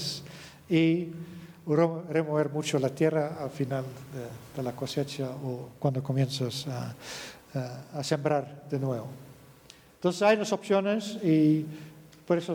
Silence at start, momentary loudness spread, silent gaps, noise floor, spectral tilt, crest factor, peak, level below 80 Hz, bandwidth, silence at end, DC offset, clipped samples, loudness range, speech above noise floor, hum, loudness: 0 s; 16 LU; none; -55 dBFS; -6 dB/octave; 18 dB; -12 dBFS; -68 dBFS; 20 kHz; 0 s; under 0.1%; under 0.1%; 5 LU; 26 dB; none; -29 LUFS